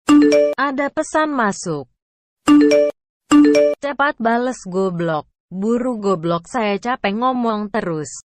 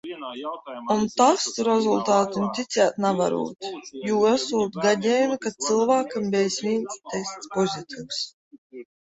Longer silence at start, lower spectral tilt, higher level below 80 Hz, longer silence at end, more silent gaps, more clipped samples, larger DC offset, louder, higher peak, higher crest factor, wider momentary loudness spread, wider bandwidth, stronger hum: about the same, 0.1 s vs 0.05 s; first, -5.5 dB/octave vs -4 dB/octave; first, -54 dBFS vs -66 dBFS; second, 0.05 s vs 0.25 s; first, 2.02-2.37 s, 3.09-3.20 s, 5.40-5.48 s vs 8.33-8.51 s, 8.58-8.70 s; neither; neither; first, -17 LUFS vs -24 LUFS; about the same, -4 dBFS vs -4 dBFS; second, 14 dB vs 20 dB; about the same, 11 LU vs 13 LU; first, 10 kHz vs 8.2 kHz; neither